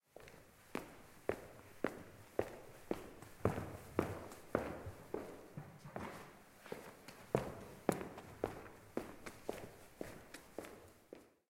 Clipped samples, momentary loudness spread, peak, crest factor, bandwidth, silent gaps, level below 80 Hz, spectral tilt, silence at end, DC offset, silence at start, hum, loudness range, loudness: under 0.1%; 16 LU; -16 dBFS; 30 dB; 16.5 kHz; none; -66 dBFS; -6 dB/octave; 0.2 s; under 0.1%; 0.15 s; none; 4 LU; -46 LUFS